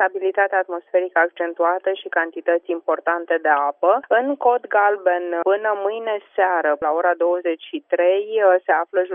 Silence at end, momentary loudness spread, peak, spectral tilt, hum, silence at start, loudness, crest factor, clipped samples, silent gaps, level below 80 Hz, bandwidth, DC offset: 0 s; 6 LU; -4 dBFS; -7 dB/octave; none; 0 s; -20 LUFS; 16 dB; under 0.1%; none; -74 dBFS; 3.7 kHz; under 0.1%